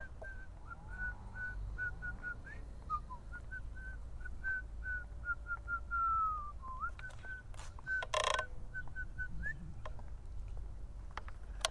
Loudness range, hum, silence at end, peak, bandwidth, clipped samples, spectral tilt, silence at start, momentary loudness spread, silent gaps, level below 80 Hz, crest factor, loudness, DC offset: 6 LU; none; 0 s; -14 dBFS; 11.5 kHz; under 0.1%; -3 dB/octave; 0 s; 15 LU; none; -48 dBFS; 28 dB; -42 LUFS; under 0.1%